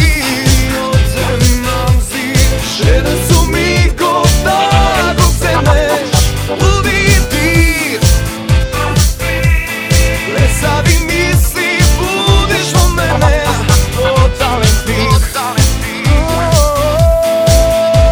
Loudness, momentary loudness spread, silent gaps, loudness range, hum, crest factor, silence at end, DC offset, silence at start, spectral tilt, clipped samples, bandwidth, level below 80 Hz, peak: -11 LUFS; 3 LU; none; 1 LU; none; 10 dB; 0 s; under 0.1%; 0 s; -4.5 dB/octave; under 0.1%; over 20 kHz; -14 dBFS; 0 dBFS